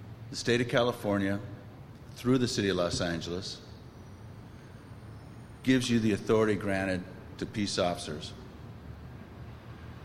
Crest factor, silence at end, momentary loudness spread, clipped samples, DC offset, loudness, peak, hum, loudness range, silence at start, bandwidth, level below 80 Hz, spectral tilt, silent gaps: 20 dB; 0 s; 22 LU; under 0.1%; under 0.1%; -30 LUFS; -12 dBFS; none; 5 LU; 0 s; 15.5 kHz; -56 dBFS; -5 dB/octave; none